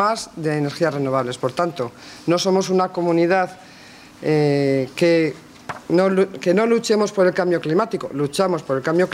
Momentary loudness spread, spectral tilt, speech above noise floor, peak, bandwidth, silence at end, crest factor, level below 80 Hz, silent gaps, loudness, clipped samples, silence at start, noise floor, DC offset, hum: 7 LU; -6 dB/octave; 24 dB; -6 dBFS; 15 kHz; 0 s; 14 dB; -62 dBFS; none; -20 LUFS; under 0.1%; 0 s; -43 dBFS; under 0.1%; none